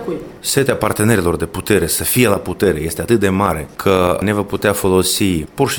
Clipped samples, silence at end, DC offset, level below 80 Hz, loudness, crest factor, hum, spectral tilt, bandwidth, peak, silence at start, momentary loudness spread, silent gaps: under 0.1%; 0 s; under 0.1%; -38 dBFS; -16 LUFS; 16 dB; none; -4.5 dB/octave; 18 kHz; 0 dBFS; 0 s; 5 LU; none